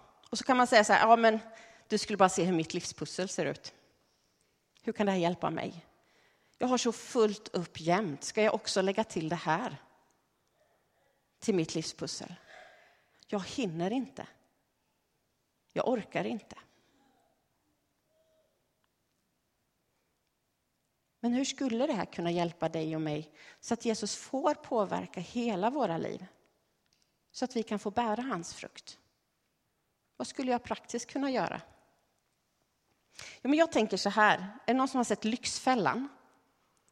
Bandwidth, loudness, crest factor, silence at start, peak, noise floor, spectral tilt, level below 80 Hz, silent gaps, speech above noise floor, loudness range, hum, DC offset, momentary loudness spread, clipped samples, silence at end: 13 kHz; -31 LUFS; 24 dB; 0.3 s; -8 dBFS; -79 dBFS; -4.5 dB/octave; -72 dBFS; none; 48 dB; 10 LU; none; under 0.1%; 16 LU; under 0.1%; 0.8 s